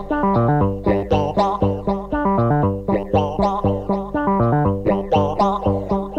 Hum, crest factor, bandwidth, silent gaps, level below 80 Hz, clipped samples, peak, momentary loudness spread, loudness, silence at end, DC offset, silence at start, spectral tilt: none; 12 dB; 8 kHz; none; -34 dBFS; under 0.1%; -6 dBFS; 4 LU; -19 LUFS; 0 s; under 0.1%; 0 s; -9 dB/octave